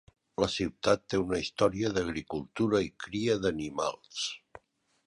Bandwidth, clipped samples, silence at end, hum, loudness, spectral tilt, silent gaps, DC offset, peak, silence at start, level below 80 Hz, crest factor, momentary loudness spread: 11.5 kHz; under 0.1%; 0.5 s; none; -31 LUFS; -5 dB/octave; none; under 0.1%; -10 dBFS; 0.4 s; -56 dBFS; 20 dB; 8 LU